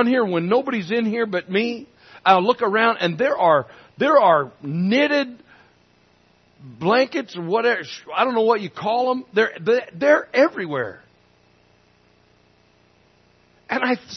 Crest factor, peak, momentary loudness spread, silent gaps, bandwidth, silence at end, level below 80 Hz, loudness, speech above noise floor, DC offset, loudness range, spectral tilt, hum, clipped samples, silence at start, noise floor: 20 dB; -2 dBFS; 10 LU; none; 6.4 kHz; 0 s; -70 dBFS; -20 LUFS; 38 dB; under 0.1%; 6 LU; -6 dB/octave; 60 Hz at -50 dBFS; under 0.1%; 0 s; -58 dBFS